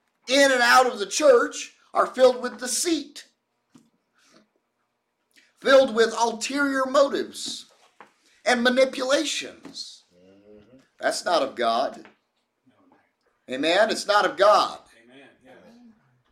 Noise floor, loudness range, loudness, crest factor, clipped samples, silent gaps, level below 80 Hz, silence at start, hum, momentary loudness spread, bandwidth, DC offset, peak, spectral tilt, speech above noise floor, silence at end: -76 dBFS; 7 LU; -21 LUFS; 18 dB; under 0.1%; none; -70 dBFS; 0.25 s; none; 15 LU; 16.5 kHz; under 0.1%; -6 dBFS; -1.5 dB/octave; 54 dB; 1.55 s